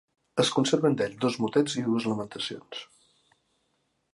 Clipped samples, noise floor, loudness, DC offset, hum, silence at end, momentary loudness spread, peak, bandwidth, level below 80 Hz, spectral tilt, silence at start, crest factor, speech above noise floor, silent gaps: under 0.1%; -74 dBFS; -27 LUFS; under 0.1%; none; 1.3 s; 12 LU; -8 dBFS; 11.5 kHz; -70 dBFS; -5 dB/octave; 0.35 s; 20 dB; 48 dB; none